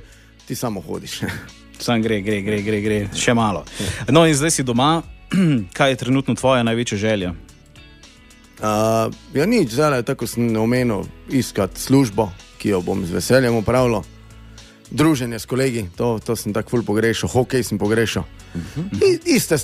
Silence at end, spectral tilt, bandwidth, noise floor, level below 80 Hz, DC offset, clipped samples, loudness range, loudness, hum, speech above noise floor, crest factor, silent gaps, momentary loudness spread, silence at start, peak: 0 s; -5 dB/octave; 15.5 kHz; -46 dBFS; -44 dBFS; under 0.1%; under 0.1%; 4 LU; -19 LUFS; none; 27 dB; 18 dB; none; 10 LU; 0 s; 0 dBFS